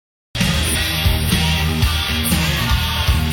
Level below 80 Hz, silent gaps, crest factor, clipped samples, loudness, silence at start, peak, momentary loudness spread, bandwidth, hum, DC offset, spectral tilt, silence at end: -22 dBFS; none; 14 dB; under 0.1%; -17 LUFS; 0.35 s; -4 dBFS; 2 LU; 17.5 kHz; none; under 0.1%; -4 dB/octave; 0 s